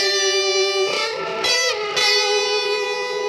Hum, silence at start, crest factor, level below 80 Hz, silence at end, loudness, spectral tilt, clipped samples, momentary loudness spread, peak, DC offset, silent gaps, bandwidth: none; 0 s; 16 dB; -66 dBFS; 0 s; -18 LUFS; 0 dB/octave; under 0.1%; 6 LU; -4 dBFS; under 0.1%; none; 14.5 kHz